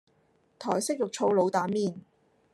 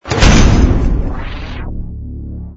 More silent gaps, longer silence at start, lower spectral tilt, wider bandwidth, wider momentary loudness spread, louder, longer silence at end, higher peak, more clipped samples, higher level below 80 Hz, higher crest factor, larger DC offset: neither; first, 0.6 s vs 0.05 s; about the same, -5 dB/octave vs -5.5 dB/octave; first, 13 kHz vs 8 kHz; second, 11 LU vs 18 LU; second, -28 LUFS vs -12 LUFS; first, 0.55 s vs 0 s; second, -12 dBFS vs 0 dBFS; second, under 0.1% vs 0.3%; second, -78 dBFS vs -14 dBFS; first, 18 dB vs 12 dB; neither